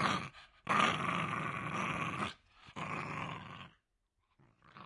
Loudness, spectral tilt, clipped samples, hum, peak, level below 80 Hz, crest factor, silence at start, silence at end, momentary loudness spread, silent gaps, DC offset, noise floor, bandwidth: -36 LUFS; -4.5 dB/octave; under 0.1%; none; -14 dBFS; -70 dBFS; 24 dB; 0 s; 0 s; 20 LU; none; under 0.1%; -82 dBFS; 11.5 kHz